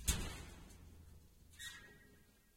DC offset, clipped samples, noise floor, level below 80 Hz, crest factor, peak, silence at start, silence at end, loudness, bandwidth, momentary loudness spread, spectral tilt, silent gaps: under 0.1%; under 0.1%; -67 dBFS; -52 dBFS; 30 dB; -18 dBFS; 0 s; 0.05 s; -48 LUFS; 16.5 kHz; 21 LU; -2.5 dB/octave; none